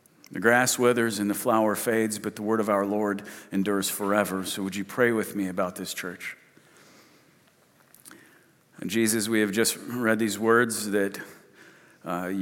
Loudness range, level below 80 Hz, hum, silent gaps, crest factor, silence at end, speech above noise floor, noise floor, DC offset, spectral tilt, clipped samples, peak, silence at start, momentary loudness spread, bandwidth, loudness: 9 LU; -78 dBFS; none; none; 22 dB; 0 s; 35 dB; -61 dBFS; under 0.1%; -4 dB/octave; under 0.1%; -6 dBFS; 0.3 s; 12 LU; 17.5 kHz; -26 LUFS